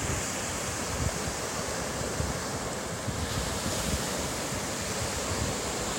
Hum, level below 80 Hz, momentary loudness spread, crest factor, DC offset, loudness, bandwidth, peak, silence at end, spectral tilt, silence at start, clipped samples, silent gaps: none; -44 dBFS; 3 LU; 16 dB; under 0.1%; -31 LUFS; 16.5 kHz; -16 dBFS; 0 s; -3 dB/octave; 0 s; under 0.1%; none